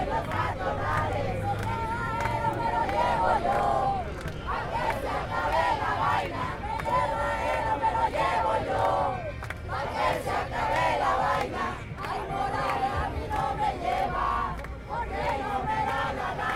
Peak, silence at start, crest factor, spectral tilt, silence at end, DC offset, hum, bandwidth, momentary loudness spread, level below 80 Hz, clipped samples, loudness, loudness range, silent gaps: -12 dBFS; 0 s; 16 dB; -5.5 dB/octave; 0 s; under 0.1%; none; 16 kHz; 7 LU; -40 dBFS; under 0.1%; -28 LUFS; 2 LU; none